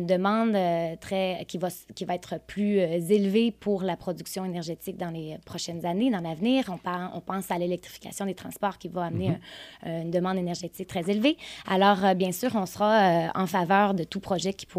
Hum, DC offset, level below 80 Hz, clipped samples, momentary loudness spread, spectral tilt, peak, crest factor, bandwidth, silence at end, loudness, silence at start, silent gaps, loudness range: none; under 0.1%; -62 dBFS; under 0.1%; 12 LU; -5.5 dB/octave; -8 dBFS; 18 dB; 15.5 kHz; 0 s; -27 LUFS; 0 s; none; 7 LU